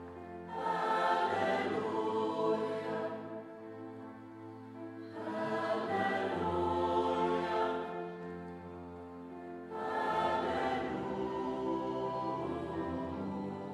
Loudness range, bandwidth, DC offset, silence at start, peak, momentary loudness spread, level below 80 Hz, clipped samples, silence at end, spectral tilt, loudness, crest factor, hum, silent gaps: 5 LU; 12 kHz; under 0.1%; 0 s; -20 dBFS; 15 LU; -64 dBFS; under 0.1%; 0 s; -6.5 dB/octave; -35 LUFS; 16 dB; none; none